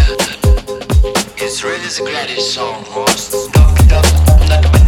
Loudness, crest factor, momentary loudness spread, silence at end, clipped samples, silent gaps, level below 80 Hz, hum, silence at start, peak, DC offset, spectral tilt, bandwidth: -13 LUFS; 10 dB; 9 LU; 0 s; under 0.1%; none; -14 dBFS; none; 0 s; 0 dBFS; under 0.1%; -4.5 dB/octave; 17 kHz